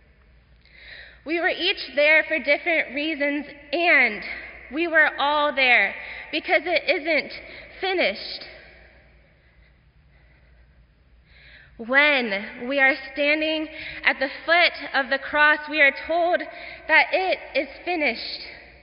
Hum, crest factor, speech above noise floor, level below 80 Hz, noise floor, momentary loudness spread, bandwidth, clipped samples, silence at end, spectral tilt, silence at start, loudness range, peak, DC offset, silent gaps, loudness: none; 20 dB; 33 dB; -56 dBFS; -56 dBFS; 17 LU; 5.4 kHz; under 0.1%; 0.2 s; 1 dB/octave; 0.8 s; 7 LU; -4 dBFS; under 0.1%; none; -21 LUFS